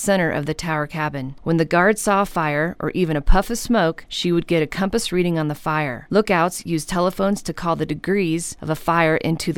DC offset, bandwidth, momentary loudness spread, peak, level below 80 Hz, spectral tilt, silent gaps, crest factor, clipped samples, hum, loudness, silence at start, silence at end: under 0.1%; 18 kHz; 7 LU; -2 dBFS; -30 dBFS; -5 dB/octave; none; 16 dB; under 0.1%; none; -21 LUFS; 0 s; 0 s